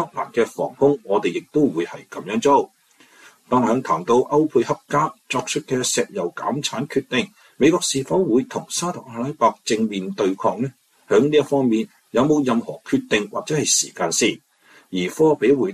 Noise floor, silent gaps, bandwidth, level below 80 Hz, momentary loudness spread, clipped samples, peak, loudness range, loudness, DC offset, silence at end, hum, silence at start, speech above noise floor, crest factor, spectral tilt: -51 dBFS; none; 14.5 kHz; -60 dBFS; 8 LU; under 0.1%; -4 dBFS; 2 LU; -20 LUFS; under 0.1%; 0 s; none; 0 s; 31 dB; 16 dB; -4 dB/octave